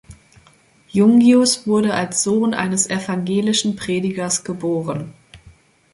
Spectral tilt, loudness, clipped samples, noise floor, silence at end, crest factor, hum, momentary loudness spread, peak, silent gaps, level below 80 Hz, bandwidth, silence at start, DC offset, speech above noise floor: -4 dB/octave; -17 LUFS; under 0.1%; -53 dBFS; 0.45 s; 16 dB; none; 11 LU; -2 dBFS; none; -54 dBFS; 11.5 kHz; 0.1 s; under 0.1%; 36 dB